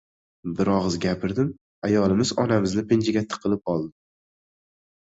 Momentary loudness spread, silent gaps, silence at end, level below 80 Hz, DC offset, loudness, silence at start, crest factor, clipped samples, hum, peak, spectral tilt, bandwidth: 8 LU; 1.61-1.82 s; 1.25 s; -50 dBFS; under 0.1%; -24 LUFS; 0.45 s; 18 dB; under 0.1%; none; -8 dBFS; -6 dB/octave; 8 kHz